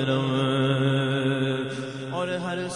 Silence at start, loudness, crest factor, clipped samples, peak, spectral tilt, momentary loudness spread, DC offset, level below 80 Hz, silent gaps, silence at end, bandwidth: 0 s; -25 LUFS; 14 dB; under 0.1%; -10 dBFS; -6.5 dB/octave; 8 LU; under 0.1%; -64 dBFS; none; 0 s; 10.5 kHz